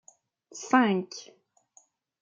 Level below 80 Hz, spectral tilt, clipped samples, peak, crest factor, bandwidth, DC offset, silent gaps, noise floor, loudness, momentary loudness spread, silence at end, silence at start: -80 dBFS; -5 dB/octave; under 0.1%; -8 dBFS; 22 dB; 7.8 kHz; under 0.1%; none; -63 dBFS; -25 LUFS; 21 LU; 1 s; 0.55 s